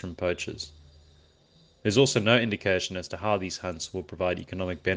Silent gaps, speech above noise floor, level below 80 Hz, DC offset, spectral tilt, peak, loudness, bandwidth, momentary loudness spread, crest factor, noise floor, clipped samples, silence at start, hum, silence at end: none; 33 dB; -56 dBFS; under 0.1%; -4.5 dB/octave; -4 dBFS; -27 LUFS; 10 kHz; 13 LU; 24 dB; -60 dBFS; under 0.1%; 0.05 s; none; 0 s